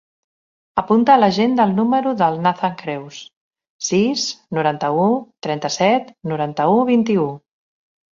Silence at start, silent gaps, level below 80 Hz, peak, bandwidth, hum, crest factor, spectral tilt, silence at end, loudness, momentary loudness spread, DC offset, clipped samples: 0.75 s; 3.36-3.51 s, 3.70-3.79 s; -62 dBFS; -2 dBFS; 7.6 kHz; none; 16 dB; -5 dB/octave; 0.75 s; -18 LUFS; 13 LU; under 0.1%; under 0.1%